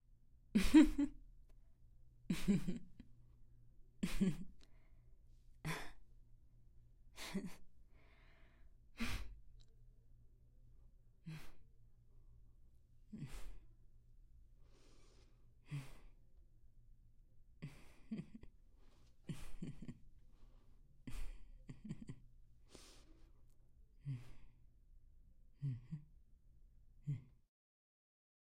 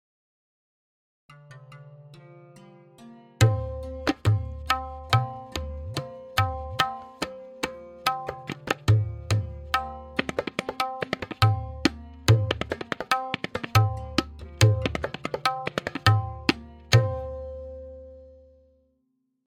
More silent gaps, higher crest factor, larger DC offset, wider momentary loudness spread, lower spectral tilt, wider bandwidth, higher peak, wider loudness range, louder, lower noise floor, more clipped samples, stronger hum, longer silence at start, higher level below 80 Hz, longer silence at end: neither; about the same, 28 dB vs 26 dB; neither; first, 21 LU vs 13 LU; about the same, -6 dB/octave vs -5.5 dB/octave; about the same, 16 kHz vs 16 kHz; second, -18 dBFS vs 0 dBFS; first, 15 LU vs 5 LU; second, -41 LUFS vs -27 LUFS; second, -66 dBFS vs -74 dBFS; neither; neither; second, 0.35 s vs 1.3 s; second, -56 dBFS vs -46 dBFS; first, 1.3 s vs 1.15 s